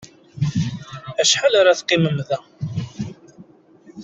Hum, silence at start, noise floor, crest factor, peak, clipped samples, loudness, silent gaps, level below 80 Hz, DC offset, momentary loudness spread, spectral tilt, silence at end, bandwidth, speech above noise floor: none; 0 s; -48 dBFS; 18 dB; -2 dBFS; under 0.1%; -19 LUFS; none; -56 dBFS; under 0.1%; 17 LU; -4 dB/octave; 0 s; 8.2 kHz; 31 dB